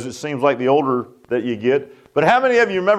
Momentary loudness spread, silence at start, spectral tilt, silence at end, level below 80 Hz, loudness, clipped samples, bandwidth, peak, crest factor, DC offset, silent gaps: 10 LU; 0 s; -5.5 dB/octave; 0 s; -62 dBFS; -18 LUFS; under 0.1%; 12 kHz; -2 dBFS; 16 dB; under 0.1%; none